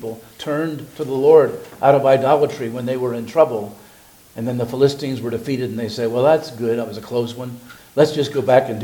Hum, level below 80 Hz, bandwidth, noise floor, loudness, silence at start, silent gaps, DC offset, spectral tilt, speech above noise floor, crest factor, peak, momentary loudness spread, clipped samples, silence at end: none; -60 dBFS; 19 kHz; -47 dBFS; -18 LUFS; 0 s; none; under 0.1%; -6.5 dB/octave; 29 dB; 18 dB; 0 dBFS; 14 LU; under 0.1%; 0 s